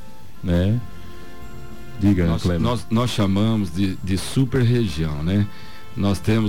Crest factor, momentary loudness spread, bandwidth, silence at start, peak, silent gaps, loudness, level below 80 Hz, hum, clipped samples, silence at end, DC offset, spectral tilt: 14 dB; 20 LU; 16.5 kHz; 0 s; -8 dBFS; none; -21 LUFS; -38 dBFS; none; under 0.1%; 0 s; 3%; -7 dB/octave